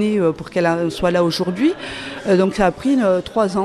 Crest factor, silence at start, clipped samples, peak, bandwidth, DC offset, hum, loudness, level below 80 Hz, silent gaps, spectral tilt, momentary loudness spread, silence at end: 14 dB; 0 s; under 0.1%; -4 dBFS; 13.5 kHz; under 0.1%; none; -18 LUFS; -44 dBFS; none; -6 dB/octave; 3 LU; 0 s